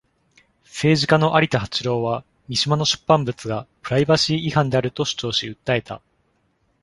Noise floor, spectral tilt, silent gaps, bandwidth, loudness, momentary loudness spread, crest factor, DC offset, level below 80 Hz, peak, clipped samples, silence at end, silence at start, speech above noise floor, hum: -66 dBFS; -5 dB/octave; none; 11.5 kHz; -20 LUFS; 12 LU; 20 dB; under 0.1%; -52 dBFS; -2 dBFS; under 0.1%; 0.85 s; 0.75 s; 46 dB; none